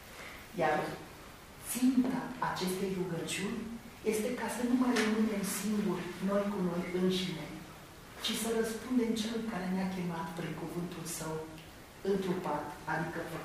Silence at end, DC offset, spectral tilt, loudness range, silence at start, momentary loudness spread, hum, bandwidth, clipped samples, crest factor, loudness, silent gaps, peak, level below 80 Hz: 0 s; under 0.1%; -5 dB/octave; 5 LU; 0 s; 16 LU; none; 15.5 kHz; under 0.1%; 16 dB; -34 LUFS; none; -18 dBFS; -60 dBFS